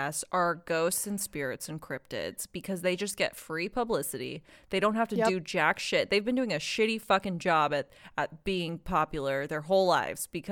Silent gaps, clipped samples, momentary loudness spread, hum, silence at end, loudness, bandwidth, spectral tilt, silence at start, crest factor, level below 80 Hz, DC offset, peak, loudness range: none; under 0.1%; 10 LU; none; 0 s; -30 LUFS; 18.5 kHz; -4 dB/octave; 0 s; 20 dB; -56 dBFS; under 0.1%; -10 dBFS; 5 LU